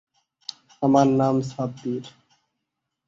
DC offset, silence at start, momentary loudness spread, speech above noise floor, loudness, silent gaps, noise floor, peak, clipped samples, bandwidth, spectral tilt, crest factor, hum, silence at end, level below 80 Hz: under 0.1%; 0.8 s; 20 LU; 60 dB; -22 LUFS; none; -81 dBFS; -6 dBFS; under 0.1%; 7.6 kHz; -7.5 dB/octave; 20 dB; none; 1 s; -64 dBFS